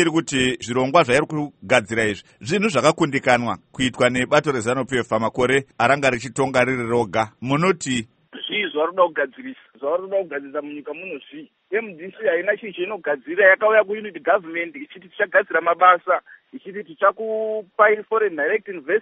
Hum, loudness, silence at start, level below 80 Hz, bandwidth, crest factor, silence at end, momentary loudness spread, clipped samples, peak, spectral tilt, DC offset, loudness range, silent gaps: none; -20 LUFS; 0 s; -56 dBFS; 8.8 kHz; 20 dB; 0 s; 15 LU; under 0.1%; 0 dBFS; -4.5 dB/octave; under 0.1%; 6 LU; none